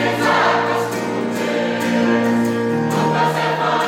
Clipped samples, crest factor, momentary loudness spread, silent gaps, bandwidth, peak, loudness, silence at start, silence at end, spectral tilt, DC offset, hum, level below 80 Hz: under 0.1%; 14 dB; 5 LU; none; 16.5 kHz; -4 dBFS; -18 LUFS; 0 s; 0 s; -5.5 dB/octave; under 0.1%; none; -60 dBFS